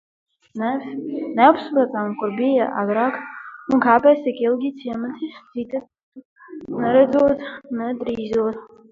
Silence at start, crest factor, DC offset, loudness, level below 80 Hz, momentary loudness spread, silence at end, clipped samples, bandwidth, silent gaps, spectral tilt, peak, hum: 0.55 s; 20 dB; under 0.1%; -20 LUFS; -60 dBFS; 16 LU; 0.25 s; under 0.1%; 7.2 kHz; 6.03-6.12 s, 6.25-6.36 s; -7.5 dB/octave; 0 dBFS; none